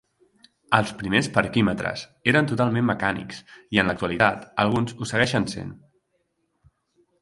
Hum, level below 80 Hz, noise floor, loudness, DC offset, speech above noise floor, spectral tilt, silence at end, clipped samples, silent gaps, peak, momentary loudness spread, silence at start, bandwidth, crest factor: none; -52 dBFS; -72 dBFS; -23 LUFS; under 0.1%; 49 dB; -5.5 dB/octave; 1.45 s; under 0.1%; none; 0 dBFS; 9 LU; 0.7 s; 11.5 kHz; 24 dB